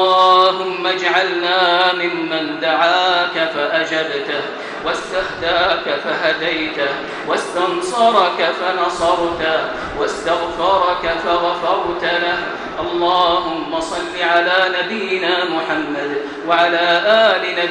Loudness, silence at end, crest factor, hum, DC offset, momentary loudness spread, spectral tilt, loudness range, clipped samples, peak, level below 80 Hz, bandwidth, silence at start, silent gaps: -16 LUFS; 0 s; 16 dB; none; under 0.1%; 9 LU; -3 dB/octave; 3 LU; under 0.1%; 0 dBFS; -48 dBFS; 11 kHz; 0 s; none